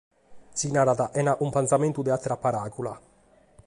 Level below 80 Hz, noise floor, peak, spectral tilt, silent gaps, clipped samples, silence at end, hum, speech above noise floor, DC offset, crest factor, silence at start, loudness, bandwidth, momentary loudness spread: -60 dBFS; -59 dBFS; -8 dBFS; -5.5 dB/octave; none; under 0.1%; 0.7 s; none; 34 dB; under 0.1%; 18 dB; 0.3 s; -26 LUFS; 11.5 kHz; 12 LU